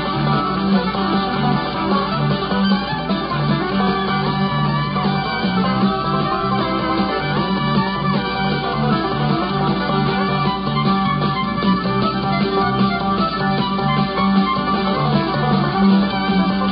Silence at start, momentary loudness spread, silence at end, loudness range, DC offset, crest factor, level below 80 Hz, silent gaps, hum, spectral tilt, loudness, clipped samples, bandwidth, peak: 0 s; 2 LU; 0 s; 2 LU; under 0.1%; 14 dB; -40 dBFS; none; none; -11 dB/octave; -18 LUFS; under 0.1%; 5.4 kHz; -4 dBFS